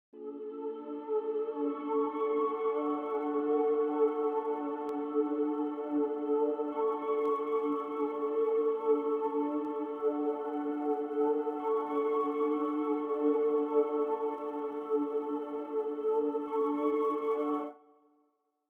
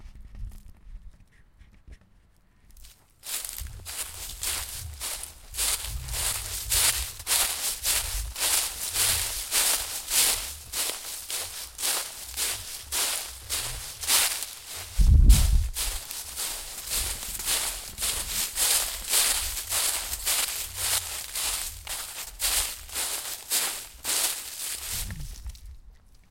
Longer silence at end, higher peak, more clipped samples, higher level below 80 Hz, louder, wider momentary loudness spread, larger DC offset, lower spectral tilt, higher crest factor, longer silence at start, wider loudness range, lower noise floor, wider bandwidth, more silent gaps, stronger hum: first, 0.95 s vs 0.1 s; second, -18 dBFS vs -6 dBFS; neither; second, -84 dBFS vs -34 dBFS; second, -32 LUFS vs -26 LUFS; second, 6 LU vs 12 LU; neither; first, -7 dB/octave vs -1 dB/octave; second, 14 dB vs 24 dB; first, 0.15 s vs 0 s; second, 2 LU vs 8 LU; first, -75 dBFS vs -60 dBFS; second, 3.6 kHz vs 17 kHz; neither; neither